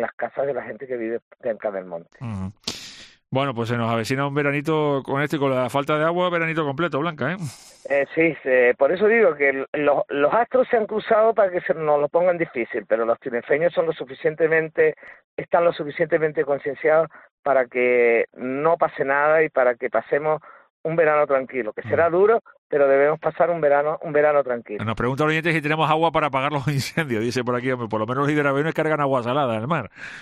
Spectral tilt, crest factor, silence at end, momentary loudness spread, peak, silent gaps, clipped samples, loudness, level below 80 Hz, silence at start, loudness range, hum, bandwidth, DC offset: -6.5 dB/octave; 16 dB; 0 s; 10 LU; -6 dBFS; 0.13-0.18 s, 1.22-1.31 s, 9.68-9.73 s, 15.24-15.37 s, 17.31-17.43 s, 20.70-20.84 s, 22.58-22.70 s; under 0.1%; -21 LUFS; -60 dBFS; 0 s; 4 LU; none; 14 kHz; under 0.1%